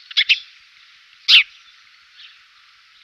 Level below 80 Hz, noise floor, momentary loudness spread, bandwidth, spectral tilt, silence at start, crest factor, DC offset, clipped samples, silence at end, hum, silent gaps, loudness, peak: -78 dBFS; -51 dBFS; 14 LU; 15.5 kHz; 6 dB/octave; 0.15 s; 20 dB; under 0.1%; under 0.1%; 1.6 s; none; none; -14 LUFS; -2 dBFS